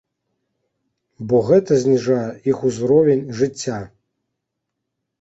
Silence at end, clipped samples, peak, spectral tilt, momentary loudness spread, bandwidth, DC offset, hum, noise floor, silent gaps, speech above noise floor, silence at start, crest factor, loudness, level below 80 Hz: 1.35 s; under 0.1%; -2 dBFS; -6.5 dB/octave; 12 LU; 8 kHz; under 0.1%; none; -79 dBFS; none; 62 dB; 1.2 s; 18 dB; -18 LUFS; -56 dBFS